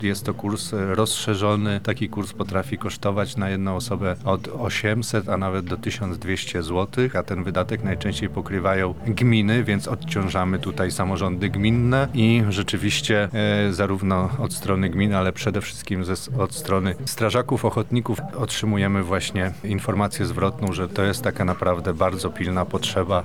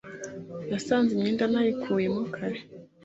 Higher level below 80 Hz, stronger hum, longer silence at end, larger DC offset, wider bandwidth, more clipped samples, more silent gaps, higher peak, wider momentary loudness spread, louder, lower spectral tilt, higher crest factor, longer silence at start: first, -46 dBFS vs -66 dBFS; neither; second, 0 s vs 0.2 s; first, 0.8% vs under 0.1%; first, 17 kHz vs 8 kHz; neither; neither; first, -6 dBFS vs -10 dBFS; second, 6 LU vs 14 LU; first, -23 LUFS vs -27 LUFS; about the same, -5.5 dB/octave vs -6 dB/octave; about the same, 16 dB vs 16 dB; about the same, 0 s vs 0.05 s